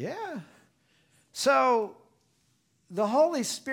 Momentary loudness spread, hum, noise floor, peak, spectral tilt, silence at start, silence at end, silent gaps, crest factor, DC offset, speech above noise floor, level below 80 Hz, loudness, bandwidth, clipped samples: 16 LU; none; -70 dBFS; -12 dBFS; -3.5 dB/octave; 0 s; 0 s; none; 18 dB; under 0.1%; 43 dB; -80 dBFS; -27 LUFS; 18 kHz; under 0.1%